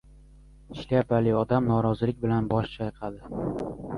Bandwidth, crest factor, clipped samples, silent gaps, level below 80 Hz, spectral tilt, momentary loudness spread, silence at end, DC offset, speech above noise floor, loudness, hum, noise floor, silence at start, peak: 10.5 kHz; 16 dB; under 0.1%; none; -48 dBFS; -9.5 dB/octave; 12 LU; 0 s; under 0.1%; 25 dB; -27 LUFS; none; -51 dBFS; 0.7 s; -10 dBFS